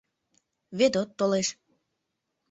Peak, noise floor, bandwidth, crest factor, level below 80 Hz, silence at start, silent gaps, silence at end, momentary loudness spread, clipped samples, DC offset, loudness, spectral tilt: -10 dBFS; -81 dBFS; 8.2 kHz; 20 dB; -70 dBFS; 0.7 s; none; 1 s; 7 LU; under 0.1%; under 0.1%; -26 LUFS; -4 dB/octave